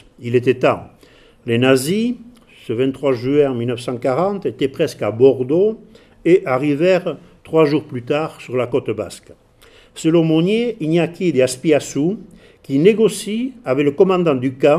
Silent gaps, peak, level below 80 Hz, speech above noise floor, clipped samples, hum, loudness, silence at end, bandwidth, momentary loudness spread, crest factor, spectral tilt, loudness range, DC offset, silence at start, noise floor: none; 0 dBFS; -54 dBFS; 31 dB; under 0.1%; none; -17 LUFS; 0 s; 15 kHz; 9 LU; 18 dB; -6 dB/octave; 3 LU; under 0.1%; 0.2 s; -48 dBFS